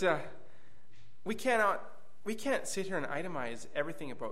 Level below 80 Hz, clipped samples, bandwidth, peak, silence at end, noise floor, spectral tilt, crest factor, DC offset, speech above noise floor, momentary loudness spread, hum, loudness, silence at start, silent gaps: -72 dBFS; under 0.1%; 15.5 kHz; -16 dBFS; 0 s; -65 dBFS; -4 dB/octave; 22 dB; 1%; 30 dB; 15 LU; none; -35 LUFS; 0 s; none